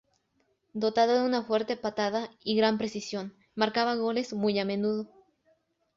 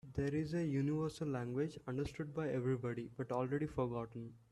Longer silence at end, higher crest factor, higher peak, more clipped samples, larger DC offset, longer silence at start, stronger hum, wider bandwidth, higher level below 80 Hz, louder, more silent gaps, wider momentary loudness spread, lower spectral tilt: first, 0.9 s vs 0.15 s; about the same, 20 dB vs 16 dB; first, -10 dBFS vs -24 dBFS; neither; neither; first, 0.75 s vs 0.05 s; neither; second, 7.6 kHz vs 12 kHz; second, -72 dBFS vs -64 dBFS; first, -29 LUFS vs -40 LUFS; neither; first, 11 LU vs 6 LU; second, -5 dB/octave vs -8 dB/octave